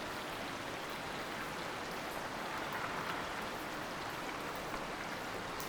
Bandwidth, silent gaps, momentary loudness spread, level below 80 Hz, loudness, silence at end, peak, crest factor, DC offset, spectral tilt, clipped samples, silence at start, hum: over 20 kHz; none; 2 LU; -62 dBFS; -41 LUFS; 0 s; -24 dBFS; 18 dB; under 0.1%; -3.5 dB/octave; under 0.1%; 0 s; none